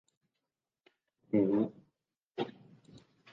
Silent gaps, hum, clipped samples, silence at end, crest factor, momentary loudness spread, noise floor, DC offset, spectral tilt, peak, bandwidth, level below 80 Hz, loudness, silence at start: 2.22-2.26 s; none; under 0.1%; 0.85 s; 20 dB; 12 LU; -90 dBFS; under 0.1%; -9 dB/octave; -18 dBFS; 6.4 kHz; -76 dBFS; -34 LUFS; 1.35 s